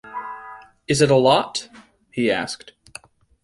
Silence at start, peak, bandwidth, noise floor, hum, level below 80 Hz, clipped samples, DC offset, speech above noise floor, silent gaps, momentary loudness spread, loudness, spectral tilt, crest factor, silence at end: 0.05 s; -2 dBFS; 11.5 kHz; -45 dBFS; none; -56 dBFS; under 0.1%; under 0.1%; 26 dB; none; 25 LU; -19 LUFS; -4.5 dB/octave; 20 dB; 0.9 s